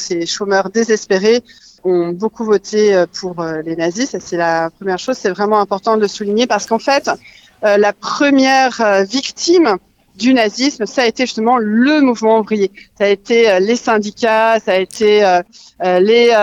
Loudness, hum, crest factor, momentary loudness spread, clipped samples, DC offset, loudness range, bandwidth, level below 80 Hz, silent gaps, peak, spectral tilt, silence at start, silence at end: -14 LUFS; none; 14 dB; 8 LU; under 0.1%; under 0.1%; 3 LU; 11 kHz; -58 dBFS; none; 0 dBFS; -4 dB/octave; 0 s; 0 s